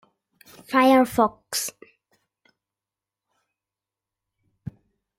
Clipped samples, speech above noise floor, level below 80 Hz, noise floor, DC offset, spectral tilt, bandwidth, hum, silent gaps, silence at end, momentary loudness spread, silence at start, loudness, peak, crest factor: under 0.1%; 69 dB; -62 dBFS; -89 dBFS; under 0.1%; -3.5 dB/octave; 16.5 kHz; none; none; 3.5 s; 24 LU; 0.7 s; -21 LUFS; -6 dBFS; 20 dB